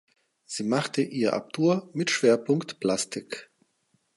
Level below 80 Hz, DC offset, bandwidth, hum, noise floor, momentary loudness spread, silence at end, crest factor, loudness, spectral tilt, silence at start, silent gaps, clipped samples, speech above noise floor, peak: -74 dBFS; under 0.1%; 11.5 kHz; none; -71 dBFS; 13 LU; 0.7 s; 20 dB; -26 LUFS; -4.5 dB/octave; 0.5 s; none; under 0.1%; 45 dB; -8 dBFS